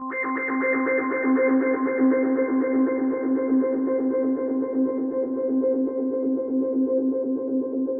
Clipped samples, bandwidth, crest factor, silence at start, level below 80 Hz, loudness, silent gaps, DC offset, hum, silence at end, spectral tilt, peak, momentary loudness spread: under 0.1%; 2.5 kHz; 12 dB; 0 s; -70 dBFS; -23 LUFS; none; under 0.1%; none; 0 s; -11.5 dB/octave; -10 dBFS; 5 LU